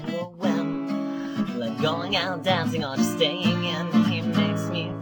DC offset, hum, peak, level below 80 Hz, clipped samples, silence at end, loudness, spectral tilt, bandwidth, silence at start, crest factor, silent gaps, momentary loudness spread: under 0.1%; none; -8 dBFS; -60 dBFS; under 0.1%; 0 s; -25 LUFS; -5.5 dB/octave; 19 kHz; 0 s; 16 dB; none; 6 LU